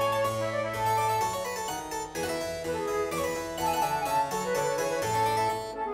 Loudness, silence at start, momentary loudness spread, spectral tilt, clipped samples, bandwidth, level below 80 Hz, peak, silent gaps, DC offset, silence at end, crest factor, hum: -29 LUFS; 0 s; 6 LU; -3.5 dB/octave; under 0.1%; 16 kHz; -56 dBFS; -16 dBFS; none; under 0.1%; 0 s; 14 dB; none